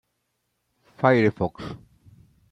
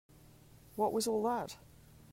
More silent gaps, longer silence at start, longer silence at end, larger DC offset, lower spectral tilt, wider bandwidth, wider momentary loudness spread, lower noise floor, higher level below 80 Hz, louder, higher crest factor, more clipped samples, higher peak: neither; first, 1 s vs 0.75 s; first, 0.75 s vs 0.15 s; neither; first, -8.5 dB/octave vs -4 dB/octave; second, 9.8 kHz vs 16 kHz; first, 19 LU vs 16 LU; first, -76 dBFS vs -59 dBFS; first, -58 dBFS vs -66 dBFS; first, -22 LUFS vs -35 LUFS; about the same, 22 dB vs 18 dB; neither; first, -4 dBFS vs -20 dBFS